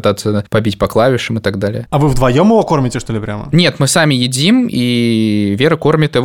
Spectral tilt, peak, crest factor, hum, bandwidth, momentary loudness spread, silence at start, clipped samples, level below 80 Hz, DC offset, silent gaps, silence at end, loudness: -5.5 dB/octave; 0 dBFS; 12 dB; none; 17 kHz; 7 LU; 0.05 s; under 0.1%; -34 dBFS; under 0.1%; none; 0 s; -13 LUFS